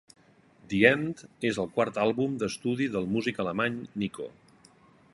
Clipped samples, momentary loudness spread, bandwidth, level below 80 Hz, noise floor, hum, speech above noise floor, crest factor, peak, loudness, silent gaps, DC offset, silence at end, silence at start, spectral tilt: under 0.1%; 12 LU; 11.5 kHz; -62 dBFS; -59 dBFS; none; 31 dB; 24 dB; -4 dBFS; -28 LUFS; none; under 0.1%; 0.85 s; 0.7 s; -5.5 dB/octave